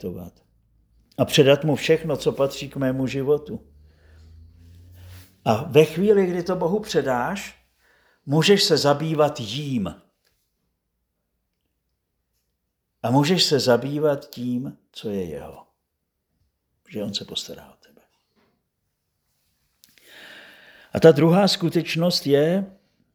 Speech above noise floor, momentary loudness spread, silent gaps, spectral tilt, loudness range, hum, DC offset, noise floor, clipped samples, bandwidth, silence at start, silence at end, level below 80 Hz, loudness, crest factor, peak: 56 dB; 20 LU; none; -5.5 dB/octave; 14 LU; none; under 0.1%; -77 dBFS; under 0.1%; over 20 kHz; 0.05 s; 0.45 s; -58 dBFS; -21 LUFS; 22 dB; 0 dBFS